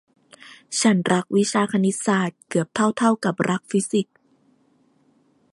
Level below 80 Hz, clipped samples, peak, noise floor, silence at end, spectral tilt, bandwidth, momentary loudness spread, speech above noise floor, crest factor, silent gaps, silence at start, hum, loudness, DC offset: -68 dBFS; under 0.1%; -4 dBFS; -62 dBFS; 1.5 s; -5 dB/octave; 11.5 kHz; 6 LU; 41 dB; 18 dB; none; 0.45 s; none; -21 LUFS; under 0.1%